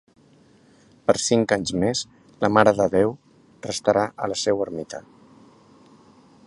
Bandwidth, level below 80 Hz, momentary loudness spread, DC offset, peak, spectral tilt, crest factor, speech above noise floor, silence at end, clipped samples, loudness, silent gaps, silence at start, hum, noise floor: 11.5 kHz; -56 dBFS; 19 LU; under 0.1%; 0 dBFS; -4.5 dB/octave; 24 dB; 34 dB; 1.45 s; under 0.1%; -22 LUFS; none; 1.1 s; none; -55 dBFS